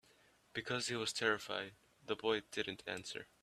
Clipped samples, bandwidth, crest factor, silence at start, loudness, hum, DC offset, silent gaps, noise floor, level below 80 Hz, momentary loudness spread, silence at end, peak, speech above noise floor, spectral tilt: under 0.1%; 14 kHz; 22 dB; 0.55 s; -40 LUFS; none; under 0.1%; none; -70 dBFS; -76 dBFS; 11 LU; 0.2 s; -18 dBFS; 29 dB; -3 dB/octave